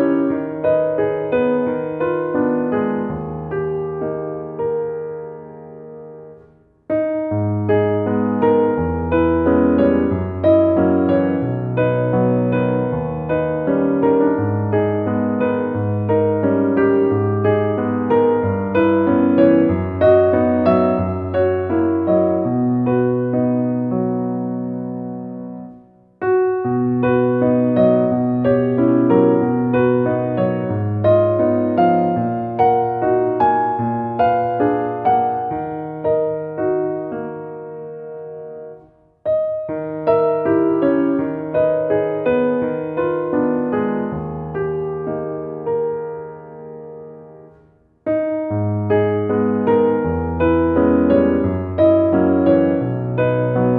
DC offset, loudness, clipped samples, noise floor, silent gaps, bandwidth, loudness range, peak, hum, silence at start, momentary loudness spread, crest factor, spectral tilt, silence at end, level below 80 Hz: under 0.1%; -18 LUFS; under 0.1%; -52 dBFS; none; 4.6 kHz; 9 LU; 0 dBFS; none; 0 s; 12 LU; 16 dB; -12 dB/octave; 0 s; -44 dBFS